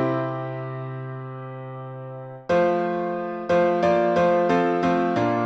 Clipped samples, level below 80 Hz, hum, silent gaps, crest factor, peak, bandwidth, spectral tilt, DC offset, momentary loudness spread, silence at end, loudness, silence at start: under 0.1%; -60 dBFS; none; none; 16 dB; -6 dBFS; 8 kHz; -7.5 dB/octave; under 0.1%; 16 LU; 0 s; -22 LUFS; 0 s